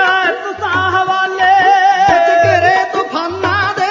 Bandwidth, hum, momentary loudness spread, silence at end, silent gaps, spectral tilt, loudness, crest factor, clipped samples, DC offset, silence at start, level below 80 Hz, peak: 7.6 kHz; none; 8 LU; 0 s; none; -4 dB/octave; -12 LUFS; 12 dB; under 0.1%; under 0.1%; 0 s; -42 dBFS; 0 dBFS